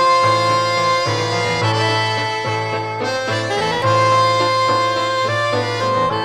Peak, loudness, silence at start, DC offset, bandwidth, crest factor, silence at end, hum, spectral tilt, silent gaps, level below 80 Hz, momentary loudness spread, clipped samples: -4 dBFS; -17 LUFS; 0 s; under 0.1%; 13.5 kHz; 12 dB; 0 s; none; -4 dB/octave; none; -52 dBFS; 6 LU; under 0.1%